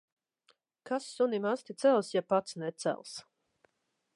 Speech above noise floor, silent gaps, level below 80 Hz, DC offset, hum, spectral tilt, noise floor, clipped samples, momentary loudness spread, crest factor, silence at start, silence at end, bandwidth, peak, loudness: 49 dB; none; -88 dBFS; under 0.1%; none; -5 dB/octave; -80 dBFS; under 0.1%; 12 LU; 20 dB; 0.85 s; 0.95 s; 11.5 kHz; -14 dBFS; -32 LUFS